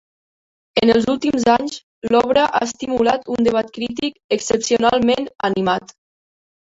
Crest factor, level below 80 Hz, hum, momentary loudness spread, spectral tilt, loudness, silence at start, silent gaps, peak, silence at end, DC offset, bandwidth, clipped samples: 16 dB; -50 dBFS; none; 8 LU; -4 dB/octave; -18 LUFS; 0.75 s; 1.83-2.02 s, 4.24-4.29 s; -2 dBFS; 0.85 s; under 0.1%; 8 kHz; under 0.1%